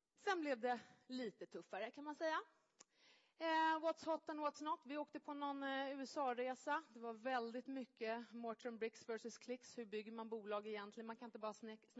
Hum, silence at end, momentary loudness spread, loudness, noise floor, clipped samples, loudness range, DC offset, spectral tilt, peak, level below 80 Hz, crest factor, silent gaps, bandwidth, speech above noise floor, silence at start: none; 0 s; 10 LU; -46 LUFS; -74 dBFS; under 0.1%; 5 LU; under 0.1%; -1.5 dB/octave; -30 dBFS; under -90 dBFS; 16 dB; none; 7.6 kHz; 28 dB; 0.2 s